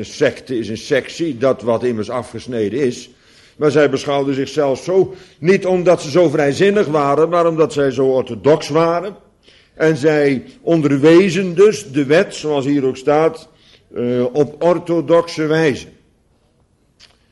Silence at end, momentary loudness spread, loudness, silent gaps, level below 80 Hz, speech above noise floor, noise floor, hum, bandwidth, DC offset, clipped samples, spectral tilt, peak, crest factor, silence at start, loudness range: 1.45 s; 9 LU; -16 LUFS; none; -54 dBFS; 42 dB; -57 dBFS; none; 11.5 kHz; under 0.1%; under 0.1%; -6 dB/octave; -2 dBFS; 14 dB; 0 s; 4 LU